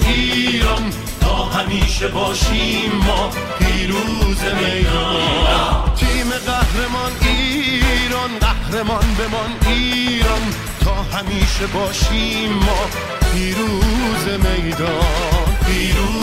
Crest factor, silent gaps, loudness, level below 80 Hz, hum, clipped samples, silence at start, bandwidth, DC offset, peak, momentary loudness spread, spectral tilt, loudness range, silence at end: 14 dB; none; -17 LUFS; -20 dBFS; none; under 0.1%; 0 s; 16 kHz; under 0.1%; -2 dBFS; 4 LU; -4.5 dB/octave; 1 LU; 0 s